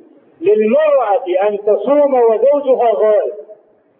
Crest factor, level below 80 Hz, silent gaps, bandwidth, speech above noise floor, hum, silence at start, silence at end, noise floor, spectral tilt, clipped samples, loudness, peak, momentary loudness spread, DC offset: 12 dB; -72 dBFS; none; 3.6 kHz; 30 dB; none; 0.4 s; 0.45 s; -42 dBFS; -10 dB/octave; under 0.1%; -13 LUFS; -2 dBFS; 5 LU; under 0.1%